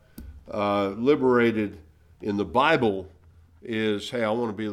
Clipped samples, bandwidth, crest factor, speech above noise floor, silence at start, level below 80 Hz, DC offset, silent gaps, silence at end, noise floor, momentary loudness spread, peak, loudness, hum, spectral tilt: under 0.1%; 15.5 kHz; 18 dB; 30 dB; 0.15 s; -54 dBFS; under 0.1%; none; 0 s; -54 dBFS; 14 LU; -6 dBFS; -24 LUFS; none; -6.5 dB/octave